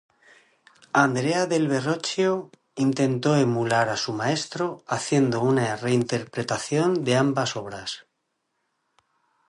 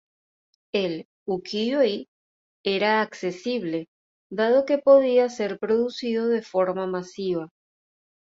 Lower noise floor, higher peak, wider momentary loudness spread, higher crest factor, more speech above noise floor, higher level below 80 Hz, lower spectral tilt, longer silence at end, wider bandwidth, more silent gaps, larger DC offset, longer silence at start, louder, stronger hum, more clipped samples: second, -76 dBFS vs under -90 dBFS; about the same, -4 dBFS vs -4 dBFS; second, 8 LU vs 13 LU; about the same, 20 dB vs 20 dB; second, 53 dB vs over 67 dB; about the same, -66 dBFS vs -70 dBFS; about the same, -5 dB/octave vs -5.5 dB/octave; first, 1.5 s vs 0.8 s; first, 11.5 kHz vs 7.8 kHz; second, none vs 1.05-1.26 s, 2.08-2.64 s, 3.88-4.30 s; neither; first, 0.95 s vs 0.75 s; about the same, -24 LUFS vs -24 LUFS; neither; neither